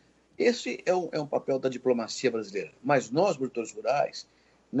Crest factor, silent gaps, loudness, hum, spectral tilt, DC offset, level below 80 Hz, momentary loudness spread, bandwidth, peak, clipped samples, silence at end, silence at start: 18 dB; none; -29 LUFS; none; -5 dB/octave; under 0.1%; -74 dBFS; 7 LU; 8.2 kHz; -10 dBFS; under 0.1%; 0 s; 0.4 s